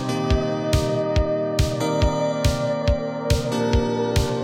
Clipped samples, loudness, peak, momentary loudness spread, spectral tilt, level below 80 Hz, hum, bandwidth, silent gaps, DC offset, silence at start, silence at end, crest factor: under 0.1%; -22 LUFS; -6 dBFS; 2 LU; -6 dB/octave; -28 dBFS; none; 16.5 kHz; none; under 0.1%; 0 s; 0 s; 16 dB